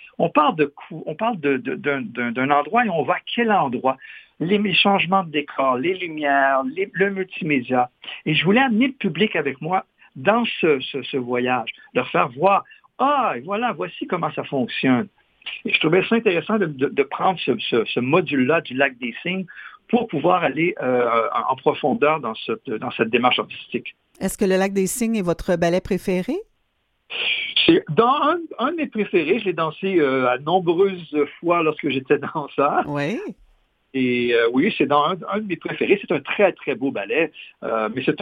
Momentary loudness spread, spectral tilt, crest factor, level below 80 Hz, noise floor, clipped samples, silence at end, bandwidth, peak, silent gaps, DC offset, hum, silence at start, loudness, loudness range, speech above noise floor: 9 LU; -5.5 dB/octave; 20 dB; -54 dBFS; -69 dBFS; under 0.1%; 0 s; 15 kHz; 0 dBFS; none; under 0.1%; none; 0 s; -21 LUFS; 2 LU; 48 dB